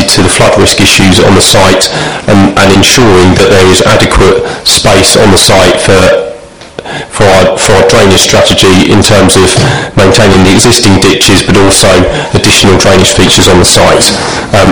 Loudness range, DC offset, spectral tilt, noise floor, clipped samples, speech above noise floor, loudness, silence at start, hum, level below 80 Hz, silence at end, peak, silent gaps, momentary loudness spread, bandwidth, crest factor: 2 LU; 7%; -3.5 dB/octave; -24 dBFS; 10%; 21 dB; -3 LUFS; 0 s; none; -22 dBFS; 0 s; 0 dBFS; none; 5 LU; over 20 kHz; 4 dB